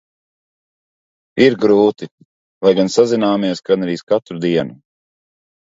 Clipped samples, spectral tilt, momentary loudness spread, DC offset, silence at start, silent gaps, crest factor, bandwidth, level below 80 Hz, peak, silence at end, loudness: under 0.1%; -6 dB/octave; 12 LU; under 0.1%; 1.35 s; 2.11-2.18 s, 2.25-2.61 s, 4.03-4.07 s; 18 dB; 8 kHz; -60 dBFS; 0 dBFS; 0.9 s; -15 LUFS